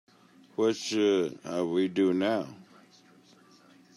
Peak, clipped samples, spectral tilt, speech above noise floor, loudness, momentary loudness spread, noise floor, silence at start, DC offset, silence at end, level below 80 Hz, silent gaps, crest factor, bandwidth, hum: -14 dBFS; under 0.1%; -5 dB/octave; 31 dB; -28 LUFS; 7 LU; -58 dBFS; 0.6 s; under 0.1%; 1.35 s; -80 dBFS; none; 16 dB; 12.5 kHz; none